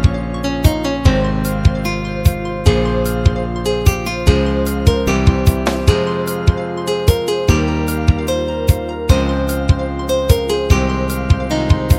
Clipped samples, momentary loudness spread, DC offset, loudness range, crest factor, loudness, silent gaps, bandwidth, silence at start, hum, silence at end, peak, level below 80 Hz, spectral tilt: under 0.1%; 4 LU; under 0.1%; 1 LU; 14 dB; -16 LUFS; none; 16.5 kHz; 0 s; none; 0 s; 0 dBFS; -20 dBFS; -6 dB/octave